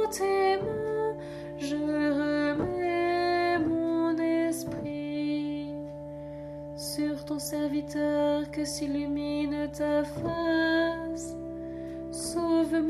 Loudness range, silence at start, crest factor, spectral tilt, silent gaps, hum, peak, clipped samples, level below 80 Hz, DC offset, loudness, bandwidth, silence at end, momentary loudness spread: 5 LU; 0 s; 14 dB; -5 dB/octave; none; none; -16 dBFS; under 0.1%; -54 dBFS; under 0.1%; -29 LUFS; 13.5 kHz; 0 s; 12 LU